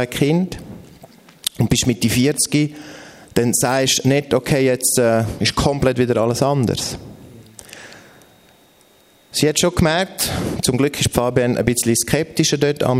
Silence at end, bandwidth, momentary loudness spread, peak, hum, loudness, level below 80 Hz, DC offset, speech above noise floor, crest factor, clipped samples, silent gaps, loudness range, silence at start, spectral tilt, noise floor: 0 s; 16 kHz; 11 LU; 0 dBFS; none; -17 LUFS; -42 dBFS; under 0.1%; 35 dB; 18 dB; under 0.1%; none; 6 LU; 0 s; -4.5 dB/octave; -52 dBFS